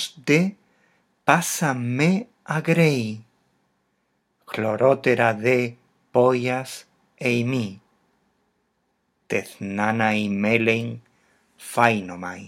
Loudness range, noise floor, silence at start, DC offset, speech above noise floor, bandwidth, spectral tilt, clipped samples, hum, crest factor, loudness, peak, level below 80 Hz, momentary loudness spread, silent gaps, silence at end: 5 LU; -71 dBFS; 0 s; under 0.1%; 50 dB; 16 kHz; -5.5 dB/octave; under 0.1%; none; 24 dB; -22 LUFS; 0 dBFS; -72 dBFS; 13 LU; none; 0 s